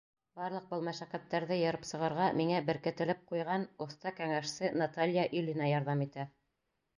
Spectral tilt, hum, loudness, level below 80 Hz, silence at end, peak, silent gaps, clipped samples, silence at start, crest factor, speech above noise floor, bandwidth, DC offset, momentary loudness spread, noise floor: -6 dB/octave; none; -35 LUFS; -76 dBFS; 0.7 s; -18 dBFS; none; under 0.1%; 0.35 s; 16 dB; 49 dB; 10.5 kHz; under 0.1%; 9 LU; -83 dBFS